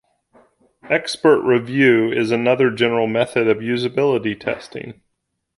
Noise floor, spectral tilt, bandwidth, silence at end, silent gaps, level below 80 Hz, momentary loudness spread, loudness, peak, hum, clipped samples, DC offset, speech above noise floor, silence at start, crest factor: -74 dBFS; -6 dB/octave; 11.5 kHz; 0.65 s; none; -60 dBFS; 11 LU; -18 LUFS; -2 dBFS; none; under 0.1%; under 0.1%; 56 dB; 0.85 s; 16 dB